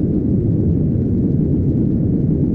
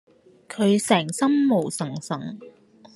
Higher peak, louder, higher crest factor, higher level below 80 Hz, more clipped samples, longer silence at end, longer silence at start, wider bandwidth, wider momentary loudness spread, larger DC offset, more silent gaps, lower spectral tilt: second, -6 dBFS vs -2 dBFS; first, -17 LUFS vs -22 LUFS; second, 10 dB vs 20 dB; first, -28 dBFS vs -72 dBFS; neither; second, 0 s vs 0.45 s; second, 0 s vs 0.5 s; second, 2.3 kHz vs 12.5 kHz; second, 1 LU vs 17 LU; neither; neither; first, -14 dB/octave vs -5 dB/octave